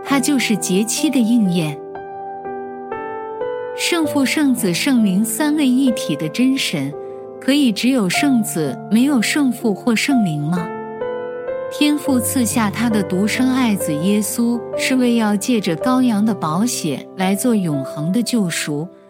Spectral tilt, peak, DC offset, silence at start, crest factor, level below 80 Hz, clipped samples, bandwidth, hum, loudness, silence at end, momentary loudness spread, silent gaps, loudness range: -4.5 dB/octave; -2 dBFS; under 0.1%; 0 s; 16 dB; -64 dBFS; under 0.1%; 16.5 kHz; none; -18 LUFS; 0.15 s; 10 LU; none; 3 LU